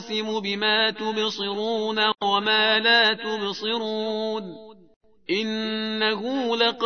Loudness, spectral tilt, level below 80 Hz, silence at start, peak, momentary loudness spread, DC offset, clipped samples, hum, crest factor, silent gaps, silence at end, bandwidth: -23 LUFS; -3.5 dB/octave; -70 dBFS; 0 s; -6 dBFS; 10 LU; 0.1%; under 0.1%; none; 18 dB; 4.96-5.01 s; 0 s; 6.6 kHz